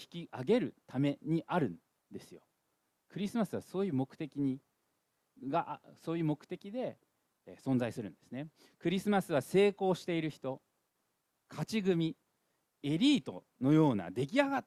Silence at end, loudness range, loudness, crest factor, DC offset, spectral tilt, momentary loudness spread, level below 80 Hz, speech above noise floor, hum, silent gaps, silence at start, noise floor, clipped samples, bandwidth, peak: 0.05 s; 6 LU; -34 LUFS; 22 dB; under 0.1%; -6.5 dB/octave; 17 LU; -74 dBFS; 48 dB; none; none; 0 s; -82 dBFS; under 0.1%; 14 kHz; -12 dBFS